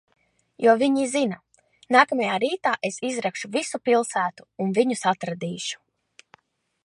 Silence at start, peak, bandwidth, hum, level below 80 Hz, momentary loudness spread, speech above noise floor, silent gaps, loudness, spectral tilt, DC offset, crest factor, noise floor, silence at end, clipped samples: 0.6 s; -4 dBFS; 11.5 kHz; none; -76 dBFS; 11 LU; 36 dB; none; -23 LUFS; -4 dB/octave; under 0.1%; 20 dB; -59 dBFS; 1.1 s; under 0.1%